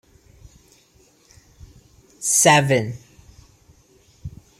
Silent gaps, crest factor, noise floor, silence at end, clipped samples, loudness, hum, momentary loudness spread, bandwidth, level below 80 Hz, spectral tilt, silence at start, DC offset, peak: none; 22 dB; -56 dBFS; 0.3 s; under 0.1%; -17 LUFS; none; 27 LU; 16 kHz; -52 dBFS; -3 dB/octave; 2.2 s; under 0.1%; -2 dBFS